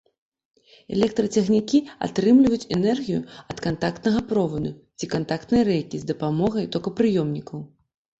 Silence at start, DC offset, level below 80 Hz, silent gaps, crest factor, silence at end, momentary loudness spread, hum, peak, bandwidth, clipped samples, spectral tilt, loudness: 0.9 s; under 0.1%; -52 dBFS; none; 16 dB; 0.55 s; 11 LU; none; -6 dBFS; 8 kHz; under 0.1%; -6.5 dB/octave; -23 LUFS